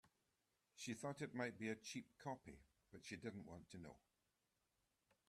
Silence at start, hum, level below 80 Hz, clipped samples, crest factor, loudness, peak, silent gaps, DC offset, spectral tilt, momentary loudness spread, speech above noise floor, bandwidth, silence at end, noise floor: 0.05 s; none; -82 dBFS; under 0.1%; 24 dB; -52 LUFS; -32 dBFS; none; under 0.1%; -4.5 dB/octave; 14 LU; 36 dB; 14 kHz; 1.3 s; -89 dBFS